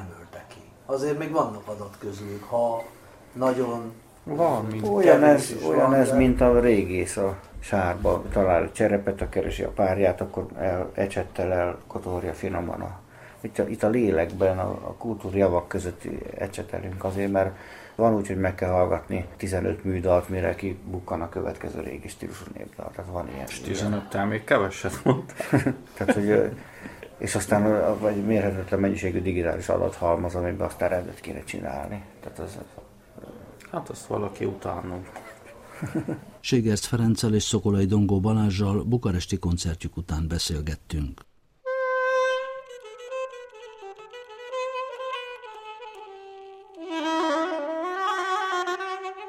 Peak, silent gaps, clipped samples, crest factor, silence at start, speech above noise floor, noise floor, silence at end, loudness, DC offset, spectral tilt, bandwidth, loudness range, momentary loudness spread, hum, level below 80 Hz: -2 dBFS; none; under 0.1%; 24 dB; 0 s; 22 dB; -47 dBFS; 0 s; -26 LUFS; under 0.1%; -6 dB/octave; 16 kHz; 12 LU; 18 LU; none; -46 dBFS